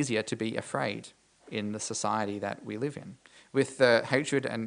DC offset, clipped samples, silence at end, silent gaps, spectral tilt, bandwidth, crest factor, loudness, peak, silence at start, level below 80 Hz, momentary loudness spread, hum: under 0.1%; under 0.1%; 0 s; none; -4.5 dB/octave; 10.5 kHz; 22 dB; -30 LUFS; -8 dBFS; 0 s; -74 dBFS; 13 LU; none